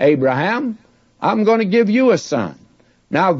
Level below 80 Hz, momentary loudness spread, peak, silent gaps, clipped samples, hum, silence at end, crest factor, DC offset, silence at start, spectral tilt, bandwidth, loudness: -64 dBFS; 11 LU; -2 dBFS; none; under 0.1%; none; 0 s; 14 dB; under 0.1%; 0 s; -6.5 dB/octave; 7.8 kHz; -17 LUFS